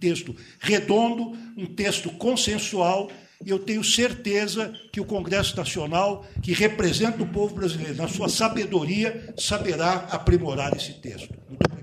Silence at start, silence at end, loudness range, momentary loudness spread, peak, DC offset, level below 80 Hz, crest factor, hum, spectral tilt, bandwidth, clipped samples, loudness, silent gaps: 0 s; 0 s; 1 LU; 11 LU; -4 dBFS; under 0.1%; -42 dBFS; 20 dB; none; -4 dB/octave; 15.5 kHz; under 0.1%; -24 LUFS; none